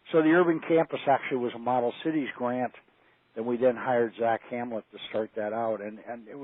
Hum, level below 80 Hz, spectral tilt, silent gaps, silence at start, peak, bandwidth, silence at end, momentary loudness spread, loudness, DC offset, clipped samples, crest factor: none; -80 dBFS; -4.5 dB/octave; none; 0.05 s; -12 dBFS; 4 kHz; 0 s; 13 LU; -28 LUFS; under 0.1%; under 0.1%; 16 dB